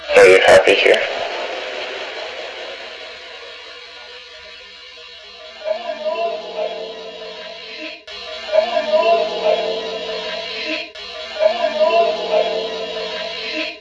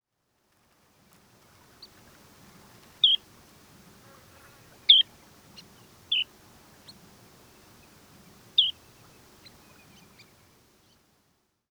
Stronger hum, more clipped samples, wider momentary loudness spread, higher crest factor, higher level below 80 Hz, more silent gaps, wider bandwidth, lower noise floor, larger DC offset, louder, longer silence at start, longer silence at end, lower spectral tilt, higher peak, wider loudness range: neither; neither; first, 22 LU vs 12 LU; second, 18 dB vs 28 dB; first, -58 dBFS vs -72 dBFS; neither; second, 11 kHz vs over 20 kHz; second, -38 dBFS vs -74 dBFS; neither; first, -17 LUFS vs -22 LUFS; second, 0 s vs 3.05 s; second, 0 s vs 3 s; first, -2.5 dB/octave vs -0.5 dB/octave; first, 0 dBFS vs -4 dBFS; first, 12 LU vs 7 LU